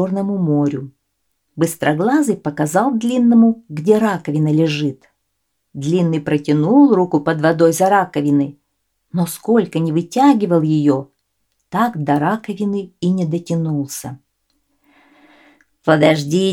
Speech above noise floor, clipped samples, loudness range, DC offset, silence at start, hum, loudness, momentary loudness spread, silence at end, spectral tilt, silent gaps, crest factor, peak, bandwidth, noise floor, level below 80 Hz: 56 dB; under 0.1%; 5 LU; under 0.1%; 0 s; none; -16 LUFS; 10 LU; 0 s; -6.5 dB/octave; none; 16 dB; 0 dBFS; 16.5 kHz; -72 dBFS; -62 dBFS